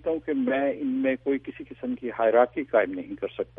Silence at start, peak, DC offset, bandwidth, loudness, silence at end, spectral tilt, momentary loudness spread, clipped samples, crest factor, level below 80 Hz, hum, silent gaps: 0.05 s; -8 dBFS; under 0.1%; 3.8 kHz; -26 LUFS; 0.15 s; -9 dB/octave; 12 LU; under 0.1%; 18 dB; -60 dBFS; none; none